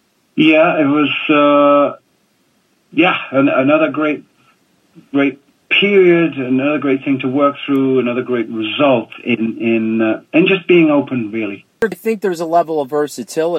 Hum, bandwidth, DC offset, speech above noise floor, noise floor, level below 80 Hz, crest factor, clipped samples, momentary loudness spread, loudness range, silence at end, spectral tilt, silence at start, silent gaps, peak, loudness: none; 14.5 kHz; under 0.1%; 45 dB; -59 dBFS; -64 dBFS; 14 dB; under 0.1%; 10 LU; 2 LU; 0 s; -6 dB/octave; 0.35 s; none; -2 dBFS; -14 LUFS